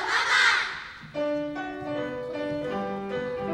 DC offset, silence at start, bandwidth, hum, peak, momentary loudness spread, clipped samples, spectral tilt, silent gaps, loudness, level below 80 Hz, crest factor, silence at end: under 0.1%; 0 s; 16 kHz; none; -10 dBFS; 13 LU; under 0.1%; -3 dB/octave; none; -27 LUFS; -60 dBFS; 18 dB; 0 s